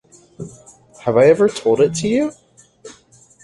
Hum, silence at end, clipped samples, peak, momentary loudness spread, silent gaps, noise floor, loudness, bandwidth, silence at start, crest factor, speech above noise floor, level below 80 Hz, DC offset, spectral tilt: none; 0.5 s; under 0.1%; -2 dBFS; 23 LU; none; -50 dBFS; -16 LUFS; 11.5 kHz; 0.4 s; 16 dB; 34 dB; -54 dBFS; under 0.1%; -5.5 dB/octave